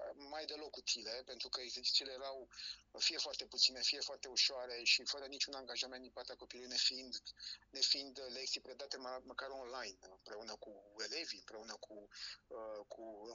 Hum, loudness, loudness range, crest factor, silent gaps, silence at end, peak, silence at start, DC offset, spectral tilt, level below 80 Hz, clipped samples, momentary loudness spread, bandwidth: none; -40 LUFS; 12 LU; 28 dB; none; 0 s; -16 dBFS; 0 s; under 0.1%; 1 dB/octave; -76 dBFS; under 0.1%; 17 LU; 9 kHz